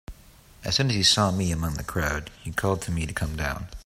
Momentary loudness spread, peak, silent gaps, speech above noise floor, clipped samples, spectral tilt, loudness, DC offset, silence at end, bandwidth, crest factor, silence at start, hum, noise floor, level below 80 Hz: 12 LU; -6 dBFS; none; 26 dB; under 0.1%; -4 dB/octave; -25 LUFS; under 0.1%; 0.05 s; 16 kHz; 20 dB; 0.1 s; none; -52 dBFS; -40 dBFS